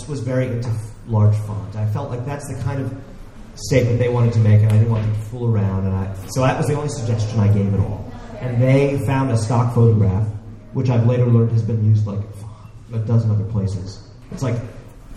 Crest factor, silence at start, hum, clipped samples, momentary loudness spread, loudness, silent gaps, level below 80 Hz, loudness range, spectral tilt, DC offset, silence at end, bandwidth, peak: 16 dB; 0 s; none; under 0.1%; 14 LU; -19 LUFS; none; -40 dBFS; 5 LU; -8 dB/octave; under 0.1%; 0 s; 11.5 kHz; -2 dBFS